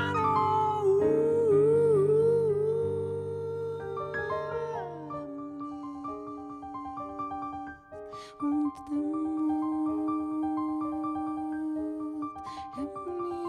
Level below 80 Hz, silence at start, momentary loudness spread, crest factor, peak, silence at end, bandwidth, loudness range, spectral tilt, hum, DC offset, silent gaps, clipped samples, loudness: -62 dBFS; 0 s; 16 LU; 14 dB; -14 dBFS; 0 s; 10 kHz; 12 LU; -8 dB/octave; none; under 0.1%; none; under 0.1%; -30 LUFS